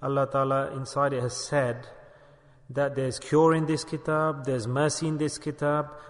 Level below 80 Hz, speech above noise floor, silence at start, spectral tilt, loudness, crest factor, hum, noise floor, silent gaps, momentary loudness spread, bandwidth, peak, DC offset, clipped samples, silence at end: -60 dBFS; 28 dB; 0 s; -5.5 dB/octave; -27 LUFS; 16 dB; none; -55 dBFS; none; 8 LU; 11 kHz; -10 dBFS; under 0.1%; under 0.1%; 0 s